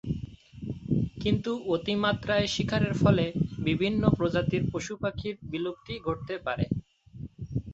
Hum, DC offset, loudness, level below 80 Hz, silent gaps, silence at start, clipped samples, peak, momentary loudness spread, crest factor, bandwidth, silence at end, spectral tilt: none; under 0.1%; -29 LUFS; -48 dBFS; none; 0.05 s; under 0.1%; -8 dBFS; 12 LU; 22 dB; 8 kHz; 0 s; -6.5 dB/octave